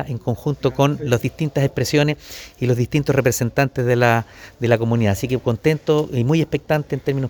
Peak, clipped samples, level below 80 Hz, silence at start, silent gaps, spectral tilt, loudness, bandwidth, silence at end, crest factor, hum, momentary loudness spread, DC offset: 0 dBFS; under 0.1%; -46 dBFS; 0 s; none; -6 dB/octave; -19 LUFS; over 20 kHz; 0 s; 18 dB; none; 6 LU; under 0.1%